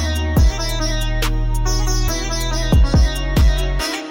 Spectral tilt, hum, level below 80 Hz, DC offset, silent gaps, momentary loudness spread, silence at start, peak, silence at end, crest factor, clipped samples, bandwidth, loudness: -4.5 dB/octave; none; -18 dBFS; under 0.1%; none; 5 LU; 0 s; -6 dBFS; 0 s; 10 dB; under 0.1%; 17 kHz; -19 LUFS